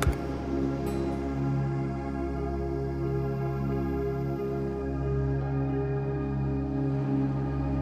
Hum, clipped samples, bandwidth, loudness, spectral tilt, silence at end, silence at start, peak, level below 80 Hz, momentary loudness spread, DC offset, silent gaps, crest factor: none; under 0.1%; 13 kHz; -30 LUFS; -8.5 dB/octave; 0 s; 0 s; -8 dBFS; -38 dBFS; 3 LU; under 0.1%; none; 22 dB